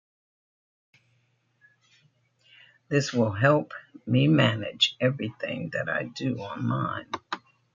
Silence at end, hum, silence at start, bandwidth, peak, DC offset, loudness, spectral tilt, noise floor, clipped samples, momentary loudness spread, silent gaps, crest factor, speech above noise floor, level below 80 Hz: 0.35 s; none; 2.9 s; 7.6 kHz; -6 dBFS; under 0.1%; -26 LUFS; -5.5 dB/octave; -69 dBFS; under 0.1%; 13 LU; none; 22 dB; 44 dB; -68 dBFS